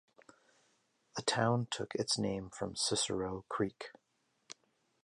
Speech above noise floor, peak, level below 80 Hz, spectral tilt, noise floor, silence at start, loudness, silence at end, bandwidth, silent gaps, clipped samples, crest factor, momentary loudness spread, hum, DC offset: 42 dB; -16 dBFS; -66 dBFS; -3.5 dB/octave; -78 dBFS; 1.15 s; -36 LUFS; 1.1 s; 11.5 kHz; none; under 0.1%; 22 dB; 20 LU; none; under 0.1%